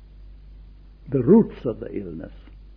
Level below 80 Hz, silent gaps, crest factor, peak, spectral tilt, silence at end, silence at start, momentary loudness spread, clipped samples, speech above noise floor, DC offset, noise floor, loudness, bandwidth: -44 dBFS; none; 20 dB; -4 dBFS; -12.5 dB/octave; 0.2 s; 0.2 s; 20 LU; under 0.1%; 24 dB; under 0.1%; -45 dBFS; -21 LUFS; 4 kHz